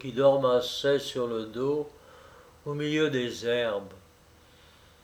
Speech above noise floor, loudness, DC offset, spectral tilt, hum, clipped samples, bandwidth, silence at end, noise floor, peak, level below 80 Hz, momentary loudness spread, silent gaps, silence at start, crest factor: 30 dB; -28 LUFS; under 0.1%; -5 dB/octave; none; under 0.1%; 19 kHz; 1.05 s; -57 dBFS; -10 dBFS; -64 dBFS; 13 LU; none; 0 s; 20 dB